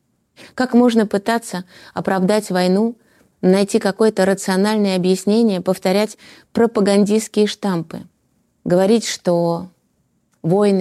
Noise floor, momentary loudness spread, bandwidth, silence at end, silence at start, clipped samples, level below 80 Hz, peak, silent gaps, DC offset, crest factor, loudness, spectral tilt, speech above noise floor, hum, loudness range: -64 dBFS; 11 LU; 14 kHz; 0 s; 0.45 s; under 0.1%; -62 dBFS; -2 dBFS; none; under 0.1%; 14 dB; -17 LUFS; -5.5 dB/octave; 48 dB; none; 2 LU